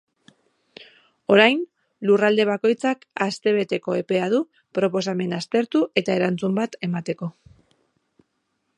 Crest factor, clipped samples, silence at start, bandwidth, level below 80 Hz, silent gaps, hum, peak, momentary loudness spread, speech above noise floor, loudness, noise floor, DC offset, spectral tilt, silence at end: 22 dB; under 0.1%; 0.8 s; 11 kHz; -70 dBFS; none; none; -2 dBFS; 11 LU; 52 dB; -22 LUFS; -74 dBFS; under 0.1%; -5.5 dB/octave; 1.5 s